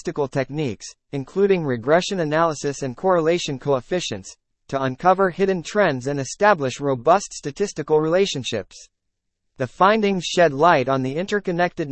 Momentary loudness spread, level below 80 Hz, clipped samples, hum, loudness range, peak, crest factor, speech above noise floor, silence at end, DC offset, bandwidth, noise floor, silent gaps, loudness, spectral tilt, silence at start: 11 LU; -54 dBFS; under 0.1%; none; 2 LU; -2 dBFS; 20 dB; 56 dB; 0 s; under 0.1%; 8.8 kHz; -76 dBFS; none; -21 LUFS; -5 dB/octave; 0.05 s